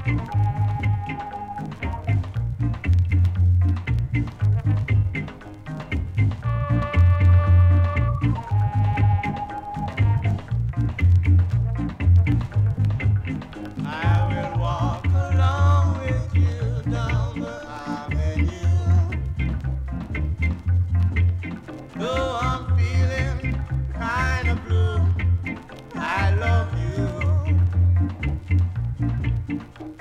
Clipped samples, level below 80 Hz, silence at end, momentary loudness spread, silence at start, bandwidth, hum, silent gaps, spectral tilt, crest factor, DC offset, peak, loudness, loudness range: under 0.1%; -30 dBFS; 0 s; 11 LU; 0 s; 7 kHz; none; none; -8 dB/octave; 14 dB; under 0.1%; -8 dBFS; -23 LUFS; 4 LU